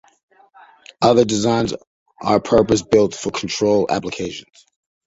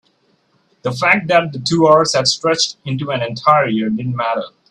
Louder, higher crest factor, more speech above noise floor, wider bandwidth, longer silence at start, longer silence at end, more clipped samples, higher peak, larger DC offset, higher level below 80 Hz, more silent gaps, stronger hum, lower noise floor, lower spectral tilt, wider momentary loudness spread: second, -18 LUFS vs -15 LUFS; about the same, 18 dB vs 16 dB; second, 31 dB vs 44 dB; second, 8 kHz vs 11.5 kHz; first, 1 s vs 0.85 s; first, 0.65 s vs 0.25 s; neither; about the same, -2 dBFS vs 0 dBFS; neither; first, -48 dBFS vs -56 dBFS; first, 1.87-2.06 s vs none; neither; second, -49 dBFS vs -60 dBFS; about the same, -5 dB/octave vs -4 dB/octave; about the same, 12 LU vs 10 LU